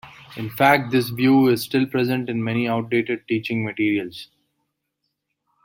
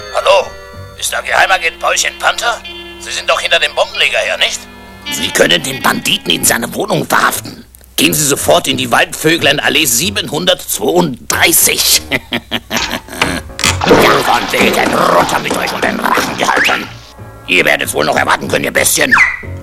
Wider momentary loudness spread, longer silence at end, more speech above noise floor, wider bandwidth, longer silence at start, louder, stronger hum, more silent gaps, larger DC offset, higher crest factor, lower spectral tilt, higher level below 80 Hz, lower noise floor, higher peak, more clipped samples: first, 15 LU vs 10 LU; first, 1.4 s vs 0 s; first, 56 dB vs 20 dB; second, 16.5 kHz vs over 20 kHz; about the same, 0.05 s vs 0 s; second, -20 LUFS vs -11 LUFS; neither; neither; neither; first, 20 dB vs 12 dB; first, -6.5 dB/octave vs -2 dB/octave; second, -64 dBFS vs -38 dBFS; first, -77 dBFS vs -32 dBFS; about the same, -2 dBFS vs 0 dBFS; second, under 0.1% vs 0.3%